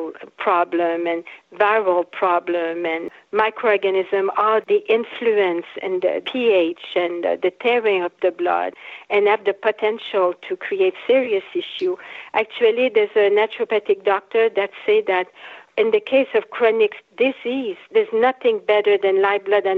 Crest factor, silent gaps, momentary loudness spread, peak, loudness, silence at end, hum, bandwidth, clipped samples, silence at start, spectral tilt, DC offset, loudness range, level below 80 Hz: 16 dB; none; 8 LU; -4 dBFS; -20 LUFS; 0 s; none; 4.8 kHz; under 0.1%; 0 s; -6 dB/octave; under 0.1%; 2 LU; -72 dBFS